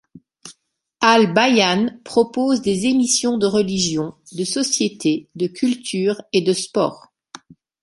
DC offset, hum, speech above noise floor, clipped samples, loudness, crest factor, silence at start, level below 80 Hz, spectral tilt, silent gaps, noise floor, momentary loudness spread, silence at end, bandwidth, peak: under 0.1%; none; 42 dB; under 0.1%; -18 LUFS; 18 dB; 0.15 s; -58 dBFS; -3.5 dB/octave; none; -61 dBFS; 9 LU; 0.85 s; 11.5 kHz; -2 dBFS